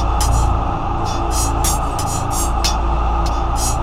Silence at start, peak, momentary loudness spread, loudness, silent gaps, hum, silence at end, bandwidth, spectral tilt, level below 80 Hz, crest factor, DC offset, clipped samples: 0 s; -4 dBFS; 3 LU; -19 LUFS; none; none; 0 s; 16 kHz; -4 dB/octave; -20 dBFS; 14 dB; under 0.1%; under 0.1%